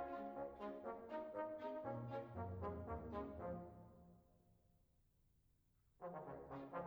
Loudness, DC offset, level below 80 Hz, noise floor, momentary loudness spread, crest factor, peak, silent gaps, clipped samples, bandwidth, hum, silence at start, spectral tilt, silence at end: -51 LUFS; under 0.1%; -68 dBFS; -78 dBFS; 9 LU; 18 dB; -34 dBFS; none; under 0.1%; over 20 kHz; none; 0 s; -9 dB/octave; 0 s